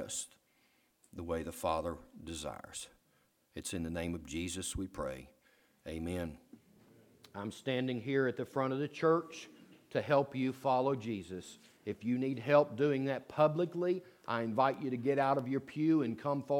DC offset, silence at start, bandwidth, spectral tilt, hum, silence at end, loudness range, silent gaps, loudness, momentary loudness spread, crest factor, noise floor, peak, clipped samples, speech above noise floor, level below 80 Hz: under 0.1%; 0 s; 17.5 kHz; -5.5 dB/octave; none; 0 s; 9 LU; none; -35 LUFS; 16 LU; 22 dB; -73 dBFS; -14 dBFS; under 0.1%; 39 dB; -62 dBFS